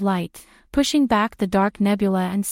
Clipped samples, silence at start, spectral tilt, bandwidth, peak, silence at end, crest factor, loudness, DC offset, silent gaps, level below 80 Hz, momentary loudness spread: under 0.1%; 0 s; -5.5 dB/octave; 16.5 kHz; -6 dBFS; 0 s; 14 dB; -21 LUFS; under 0.1%; none; -46 dBFS; 8 LU